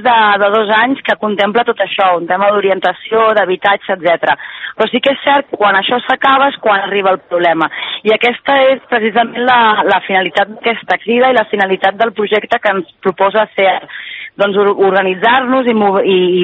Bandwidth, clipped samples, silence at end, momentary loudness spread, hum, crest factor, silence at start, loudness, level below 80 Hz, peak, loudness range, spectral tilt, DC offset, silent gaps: 7.4 kHz; under 0.1%; 0 s; 5 LU; none; 12 dB; 0 s; -12 LUFS; -60 dBFS; 0 dBFS; 1 LU; -6.5 dB/octave; under 0.1%; none